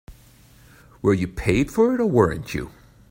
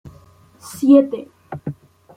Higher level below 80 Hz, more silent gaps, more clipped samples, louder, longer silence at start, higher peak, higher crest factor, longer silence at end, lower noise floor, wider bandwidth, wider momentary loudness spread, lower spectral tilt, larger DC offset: first, -42 dBFS vs -58 dBFS; neither; neither; second, -21 LUFS vs -15 LUFS; about the same, 0.1 s vs 0.05 s; about the same, -4 dBFS vs -2 dBFS; about the same, 18 dB vs 18 dB; about the same, 0.4 s vs 0.45 s; about the same, -51 dBFS vs -48 dBFS; about the same, 16.5 kHz vs 15.5 kHz; second, 12 LU vs 22 LU; about the same, -7 dB/octave vs -7.5 dB/octave; neither